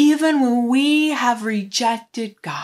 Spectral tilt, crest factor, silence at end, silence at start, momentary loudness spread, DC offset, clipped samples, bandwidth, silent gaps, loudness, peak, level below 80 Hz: -3.5 dB/octave; 12 dB; 0 s; 0 s; 11 LU; under 0.1%; under 0.1%; 13.5 kHz; none; -18 LUFS; -6 dBFS; -76 dBFS